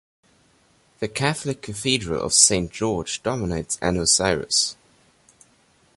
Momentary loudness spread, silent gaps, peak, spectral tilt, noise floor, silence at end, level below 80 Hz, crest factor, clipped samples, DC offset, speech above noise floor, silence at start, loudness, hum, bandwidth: 12 LU; none; 0 dBFS; -2.5 dB/octave; -60 dBFS; 1.25 s; -46 dBFS; 24 dB; under 0.1%; under 0.1%; 37 dB; 1 s; -21 LUFS; none; 14 kHz